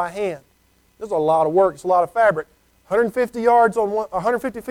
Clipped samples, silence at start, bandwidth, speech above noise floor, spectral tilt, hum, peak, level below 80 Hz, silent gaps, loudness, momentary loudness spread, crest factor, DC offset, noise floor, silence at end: under 0.1%; 0 s; 16 kHz; 41 dB; -6 dB/octave; none; -6 dBFS; -56 dBFS; none; -19 LUFS; 11 LU; 14 dB; under 0.1%; -59 dBFS; 0 s